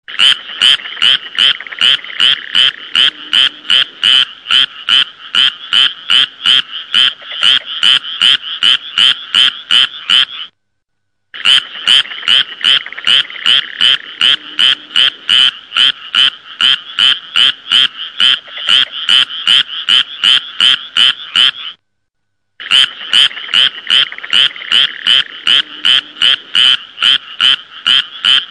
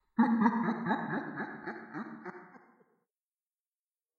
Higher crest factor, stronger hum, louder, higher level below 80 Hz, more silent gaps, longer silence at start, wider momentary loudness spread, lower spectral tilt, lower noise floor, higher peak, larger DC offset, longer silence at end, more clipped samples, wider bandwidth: second, 12 dB vs 22 dB; neither; first, -9 LUFS vs -33 LUFS; first, -60 dBFS vs -88 dBFS; neither; about the same, 0.1 s vs 0.2 s; second, 2 LU vs 19 LU; second, 1 dB/octave vs -8.5 dB/octave; second, -71 dBFS vs under -90 dBFS; first, 0 dBFS vs -12 dBFS; first, 0.1% vs under 0.1%; second, 0.05 s vs 1.6 s; neither; first, 13.5 kHz vs 6 kHz